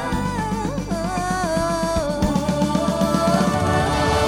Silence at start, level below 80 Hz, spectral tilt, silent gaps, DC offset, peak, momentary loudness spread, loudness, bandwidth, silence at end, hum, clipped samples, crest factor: 0 s; -34 dBFS; -5.5 dB/octave; none; under 0.1%; -6 dBFS; 6 LU; -21 LUFS; 16.5 kHz; 0 s; none; under 0.1%; 14 dB